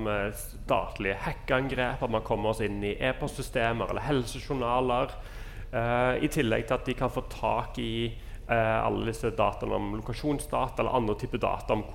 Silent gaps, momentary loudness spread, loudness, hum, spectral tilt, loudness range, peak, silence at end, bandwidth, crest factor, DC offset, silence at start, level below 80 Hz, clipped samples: none; 7 LU; -30 LUFS; none; -5.5 dB/octave; 1 LU; -10 dBFS; 0 s; 16.5 kHz; 18 dB; under 0.1%; 0 s; -40 dBFS; under 0.1%